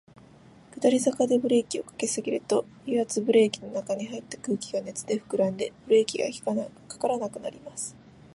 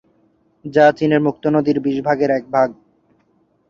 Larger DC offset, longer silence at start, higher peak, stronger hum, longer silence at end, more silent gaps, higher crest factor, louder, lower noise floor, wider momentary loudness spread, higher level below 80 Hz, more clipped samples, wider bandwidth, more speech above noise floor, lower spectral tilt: neither; about the same, 0.75 s vs 0.65 s; second, -8 dBFS vs -2 dBFS; neither; second, 0.4 s vs 0.95 s; neither; about the same, 18 dB vs 16 dB; second, -27 LUFS vs -17 LUFS; second, -53 dBFS vs -60 dBFS; first, 13 LU vs 7 LU; second, -68 dBFS vs -60 dBFS; neither; first, 11.5 kHz vs 7.2 kHz; second, 26 dB vs 45 dB; second, -4.5 dB/octave vs -7.5 dB/octave